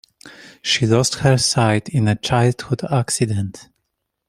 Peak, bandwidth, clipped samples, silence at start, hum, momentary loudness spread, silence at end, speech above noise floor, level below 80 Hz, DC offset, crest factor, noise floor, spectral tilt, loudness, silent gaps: -2 dBFS; 15 kHz; under 0.1%; 0.25 s; none; 9 LU; 0.65 s; 58 dB; -50 dBFS; under 0.1%; 18 dB; -75 dBFS; -4.5 dB/octave; -18 LUFS; none